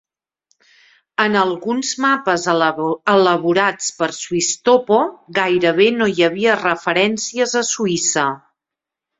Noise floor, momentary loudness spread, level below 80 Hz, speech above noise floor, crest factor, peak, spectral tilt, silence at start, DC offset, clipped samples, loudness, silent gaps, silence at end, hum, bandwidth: -85 dBFS; 7 LU; -62 dBFS; 68 dB; 16 dB; 0 dBFS; -3 dB/octave; 1.2 s; under 0.1%; under 0.1%; -17 LUFS; none; 0.85 s; none; 8 kHz